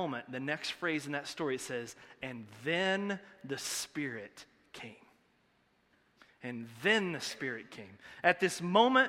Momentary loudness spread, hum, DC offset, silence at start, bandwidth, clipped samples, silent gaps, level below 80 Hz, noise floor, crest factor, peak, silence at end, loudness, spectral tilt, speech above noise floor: 19 LU; none; under 0.1%; 0 s; 16 kHz; under 0.1%; none; -76 dBFS; -72 dBFS; 24 dB; -10 dBFS; 0 s; -34 LUFS; -3.5 dB/octave; 38 dB